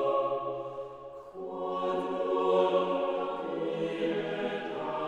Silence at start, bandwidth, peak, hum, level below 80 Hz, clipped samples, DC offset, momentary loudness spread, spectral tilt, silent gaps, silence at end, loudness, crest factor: 0 s; 9.2 kHz; -14 dBFS; none; -70 dBFS; under 0.1%; under 0.1%; 15 LU; -6.5 dB/octave; none; 0 s; -31 LUFS; 16 dB